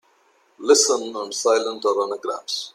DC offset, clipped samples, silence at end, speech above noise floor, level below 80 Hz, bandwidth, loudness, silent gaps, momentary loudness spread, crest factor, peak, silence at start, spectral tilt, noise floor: under 0.1%; under 0.1%; 0.05 s; 39 dB; -78 dBFS; 14.5 kHz; -21 LUFS; none; 12 LU; 20 dB; -2 dBFS; 0.6 s; 0 dB/octave; -60 dBFS